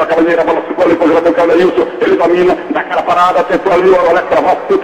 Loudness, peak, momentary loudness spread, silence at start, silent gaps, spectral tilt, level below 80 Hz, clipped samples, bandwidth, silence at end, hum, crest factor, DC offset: -10 LUFS; 0 dBFS; 4 LU; 0 s; none; -6 dB/octave; -44 dBFS; under 0.1%; 9.8 kHz; 0 s; none; 10 dB; under 0.1%